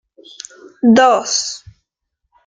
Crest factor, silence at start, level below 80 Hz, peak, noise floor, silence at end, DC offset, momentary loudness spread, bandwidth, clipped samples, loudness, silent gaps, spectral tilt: 16 dB; 0.85 s; -56 dBFS; -2 dBFS; -74 dBFS; 0.9 s; under 0.1%; 24 LU; 9.4 kHz; under 0.1%; -13 LUFS; none; -3 dB/octave